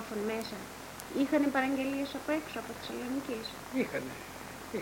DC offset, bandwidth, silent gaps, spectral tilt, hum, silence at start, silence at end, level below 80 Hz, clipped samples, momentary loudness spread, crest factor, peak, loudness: under 0.1%; 17 kHz; none; -4.5 dB/octave; none; 0 s; 0 s; -64 dBFS; under 0.1%; 14 LU; 18 dB; -16 dBFS; -35 LUFS